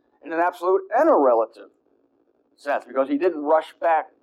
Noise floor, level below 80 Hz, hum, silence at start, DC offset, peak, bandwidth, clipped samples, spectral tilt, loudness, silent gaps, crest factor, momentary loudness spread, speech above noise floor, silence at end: -65 dBFS; -80 dBFS; none; 0.25 s; under 0.1%; -6 dBFS; 12.5 kHz; under 0.1%; -5 dB/octave; -21 LUFS; none; 16 dB; 10 LU; 44 dB; 0.2 s